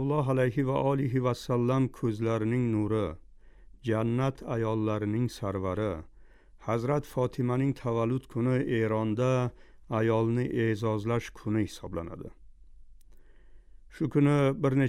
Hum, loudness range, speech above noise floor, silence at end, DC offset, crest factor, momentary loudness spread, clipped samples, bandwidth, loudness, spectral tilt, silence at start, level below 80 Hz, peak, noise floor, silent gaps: none; 4 LU; 25 dB; 0 s; under 0.1%; 16 dB; 8 LU; under 0.1%; 13.5 kHz; -29 LUFS; -8 dB/octave; 0 s; -52 dBFS; -14 dBFS; -54 dBFS; none